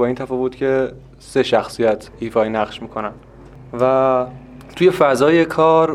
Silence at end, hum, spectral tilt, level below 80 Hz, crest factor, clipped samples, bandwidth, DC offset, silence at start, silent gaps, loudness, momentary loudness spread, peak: 0 s; none; -6 dB/octave; -48 dBFS; 18 dB; under 0.1%; 14 kHz; under 0.1%; 0 s; none; -17 LUFS; 13 LU; 0 dBFS